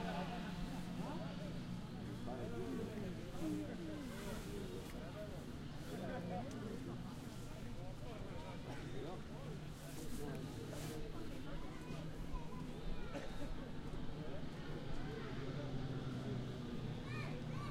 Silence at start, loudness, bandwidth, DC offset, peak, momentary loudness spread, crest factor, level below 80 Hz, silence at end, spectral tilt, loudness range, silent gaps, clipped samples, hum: 0 s; -48 LUFS; 16 kHz; under 0.1%; -30 dBFS; 5 LU; 14 dB; -54 dBFS; 0 s; -6.5 dB/octave; 3 LU; none; under 0.1%; none